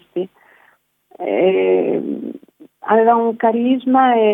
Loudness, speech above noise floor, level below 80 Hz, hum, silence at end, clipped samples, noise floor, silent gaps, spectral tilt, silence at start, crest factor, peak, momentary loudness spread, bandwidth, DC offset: -16 LUFS; 42 dB; -74 dBFS; none; 0 s; under 0.1%; -57 dBFS; none; -8.5 dB/octave; 0.15 s; 16 dB; -2 dBFS; 15 LU; 3.8 kHz; under 0.1%